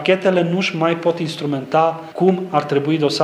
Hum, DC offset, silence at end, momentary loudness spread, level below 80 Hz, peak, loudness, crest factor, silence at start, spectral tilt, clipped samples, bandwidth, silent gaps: none; under 0.1%; 0 s; 5 LU; -70 dBFS; -2 dBFS; -18 LUFS; 16 dB; 0 s; -6 dB/octave; under 0.1%; 13 kHz; none